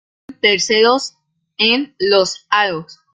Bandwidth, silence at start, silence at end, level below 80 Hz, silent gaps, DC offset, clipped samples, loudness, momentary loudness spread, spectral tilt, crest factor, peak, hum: 9.4 kHz; 0.3 s; 0.2 s; -60 dBFS; none; under 0.1%; under 0.1%; -15 LUFS; 7 LU; -2 dB/octave; 16 dB; 0 dBFS; none